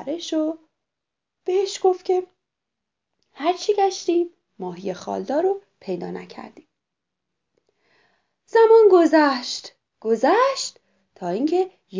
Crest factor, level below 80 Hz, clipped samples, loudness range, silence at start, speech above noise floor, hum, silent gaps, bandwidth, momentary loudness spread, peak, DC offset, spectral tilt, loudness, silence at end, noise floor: 18 dB; -78 dBFS; under 0.1%; 11 LU; 0 s; 64 dB; none; none; 7.6 kHz; 19 LU; -4 dBFS; under 0.1%; -4.5 dB/octave; -21 LUFS; 0 s; -84 dBFS